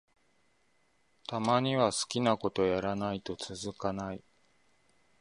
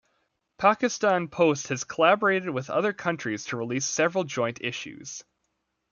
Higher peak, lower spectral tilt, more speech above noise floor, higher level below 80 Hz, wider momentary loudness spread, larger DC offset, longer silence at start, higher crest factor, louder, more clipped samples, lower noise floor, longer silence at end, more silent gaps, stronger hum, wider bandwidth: second, -12 dBFS vs -6 dBFS; about the same, -4.5 dB/octave vs -4 dB/octave; second, 42 dB vs 52 dB; first, -62 dBFS vs -70 dBFS; about the same, 11 LU vs 11 LU; neither; first, 1.3 s vs 0.6 s; about the same, 22 dB vs 20 dB; second, -32 LUFS vs -25 LUFS; neither; second, -73 dBFS vs -78 dBFS; first, 1 s vs 0.7 s; neither; neither; first, 11.5 kHz vs 7.4 kHz